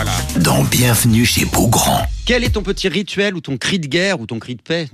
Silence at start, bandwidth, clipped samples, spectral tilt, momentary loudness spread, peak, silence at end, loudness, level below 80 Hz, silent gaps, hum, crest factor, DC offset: 0 s; 15 kHz; under 0.1%; -4 dB/octave; 9 LU; -2 dBFS; 0.05 s; -15 LUFS; -30 dBFS; none; none; 14 dB; under 0.1%